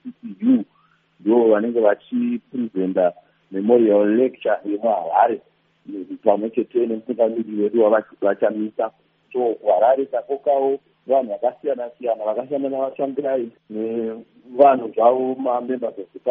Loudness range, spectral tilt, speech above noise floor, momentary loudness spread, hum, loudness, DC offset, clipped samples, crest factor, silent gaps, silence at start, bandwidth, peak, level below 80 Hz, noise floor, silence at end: 3 LU; -6 dB/octave; 40 dB; 12 LU; none; -20 LUFS; under 0.1%; under 0.1%; 20 dB; none; 0.05 s; 3.8 kHz; 0 dBFS; -76 dBFS; -60 dBFS; 0 s